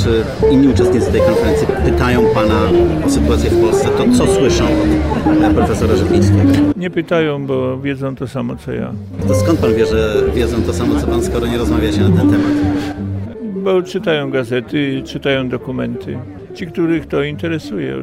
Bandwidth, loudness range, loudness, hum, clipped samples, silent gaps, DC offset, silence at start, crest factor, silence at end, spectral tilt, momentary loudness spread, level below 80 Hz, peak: 15.5 kHz; 6 LU; -15 LUFS; none; under 0.1%; none; under 0.1%; 0 s; 10 dB; 0 s; -6.5 dB/octave; 10 LU; -26 dBFS; -2 dBFS